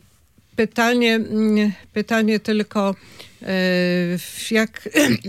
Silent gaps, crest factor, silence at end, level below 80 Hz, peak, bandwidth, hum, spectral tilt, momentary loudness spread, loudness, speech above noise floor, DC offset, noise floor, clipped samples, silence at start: none; 18 dB; 0 s; -60 dBFS; -2 dBFS; 16 kHz; none; -5 dB/octave; 8 LU; -20 LUFS; 37 dB; under 0.1%; -56 dBFS; under 0.1%; 0.55 s